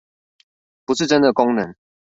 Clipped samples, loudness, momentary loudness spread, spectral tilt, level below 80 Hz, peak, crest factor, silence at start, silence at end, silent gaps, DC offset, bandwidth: under 0.1%; -18 LUFS; 14 LU; -4.5 dB/octave; -60 dBFS; -2 dBFS; 20 dB; 0.9 s; 0.4 s; none; under 0.1%; 7.8 kHz